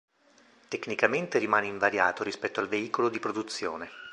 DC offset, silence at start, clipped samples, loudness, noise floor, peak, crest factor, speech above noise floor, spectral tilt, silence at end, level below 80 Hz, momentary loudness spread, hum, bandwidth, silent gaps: under 0.1%; 0.7 s; under 0.1%; -29 LUFS; -61 dBFS; -6 dBFS; 24 dB; 32 dB; -4 dB/octave; 0 s; -70 dBFS; 10 LU; none; 11 kHz; none